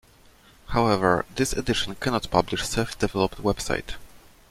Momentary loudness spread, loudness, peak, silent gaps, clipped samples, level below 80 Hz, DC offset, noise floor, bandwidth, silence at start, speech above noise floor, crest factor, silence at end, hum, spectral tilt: 7 LU; -25 LUFS; -2 dBFS; none; under 0.1%; -40 dBFS; under 0.1%; -54 dBFS; 16.5 kHz; 0.65 s; 30 dB; 22 dB; 0.35 s; none; -4.5 dB/octave